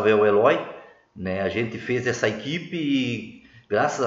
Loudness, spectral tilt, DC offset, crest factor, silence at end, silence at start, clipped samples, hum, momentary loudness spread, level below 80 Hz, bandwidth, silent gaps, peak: -24 LUFS; -5.5 dB/octave; under 0.1%; 18 dB; 0 s; 0 s; under 0.1%; none; 16 LU; -62 dBFS; 7.8 kHz; none; -6 dBFS